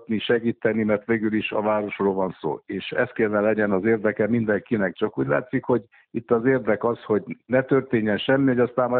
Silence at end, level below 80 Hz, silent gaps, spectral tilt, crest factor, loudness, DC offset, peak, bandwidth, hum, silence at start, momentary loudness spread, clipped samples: 0 s; -60 dBFS; none; -5 dB/octave; 16 dB; -23 LUFS; under 0.1%; -6 dBFS; 4.4 kHz; none; 0 s; 5 LU; under 0.1%